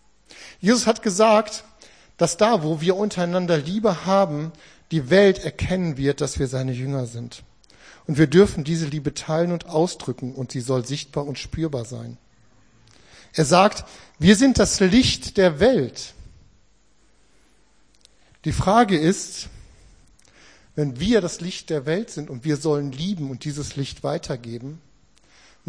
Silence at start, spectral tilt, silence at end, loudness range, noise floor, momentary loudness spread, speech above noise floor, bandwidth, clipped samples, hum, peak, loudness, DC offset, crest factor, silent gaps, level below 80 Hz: 0.35 s; -5 dB/octave; 0.9 s; 8 LU; -61 dBFS; 15 LU; 40 dB; 10.5 kHz; under 0.1%; none; -2 dBFS; -21 LUFS; 0.1%; 22 dB; none; -44 dBFS